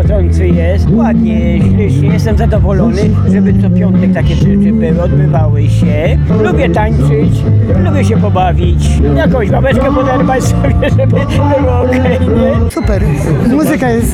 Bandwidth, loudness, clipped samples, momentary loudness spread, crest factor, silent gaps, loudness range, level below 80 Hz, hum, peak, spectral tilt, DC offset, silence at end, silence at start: 14 kHz; -10 LUFS; under 0.1%; 1 LU; 6 dB; none; 1 LU; -18 dBFS; none; -2 dBFS; -8 dB/octave; under 0.1%; 0 s; 0 s